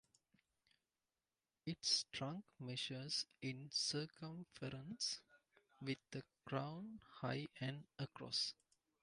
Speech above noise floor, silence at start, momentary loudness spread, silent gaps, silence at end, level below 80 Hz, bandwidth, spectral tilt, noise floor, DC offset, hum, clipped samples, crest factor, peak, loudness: over 43 dB; 1.65 s; 14 LU; none; 0.5 s; -80 dBFS; 11 kHz; -3.5 dB/octave; under -90 dBFS; under 0.1%; none; under 0.1%; 24 dB; -24 dBFS; -45 LUFS